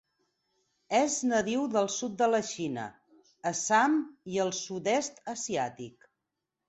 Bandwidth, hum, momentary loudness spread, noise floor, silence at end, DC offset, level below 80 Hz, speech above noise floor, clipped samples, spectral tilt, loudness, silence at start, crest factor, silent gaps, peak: 8.2 kHz; none; 11 LU; -86 dBFS; 0.8 s; under 0.1%; -72 dBFS; 56 dB; under 0.1%; -3.5 dB/octave; -30 LUFS; 0.9 s; 18 dB; none; -12 dBFS